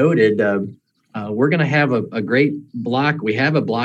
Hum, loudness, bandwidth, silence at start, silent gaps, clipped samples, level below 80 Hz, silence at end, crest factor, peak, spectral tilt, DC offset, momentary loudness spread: none; -18 LUFS; 8.2 kHz; 0 s; none; under 0.1%; -68 dBFS; 0 s; 16 dB; -2 dBFS; -8 dB/octave; under 0.1%; 11 LU